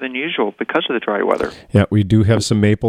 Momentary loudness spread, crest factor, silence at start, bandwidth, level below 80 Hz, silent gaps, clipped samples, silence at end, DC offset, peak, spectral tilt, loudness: 6 LU; 16 dB; 0 s; 11 kHz; -44 dBFS; none; under 0.1%; 0 s; under 0.1%; 0 dBFS; -6 dB/octave; -17 LUFS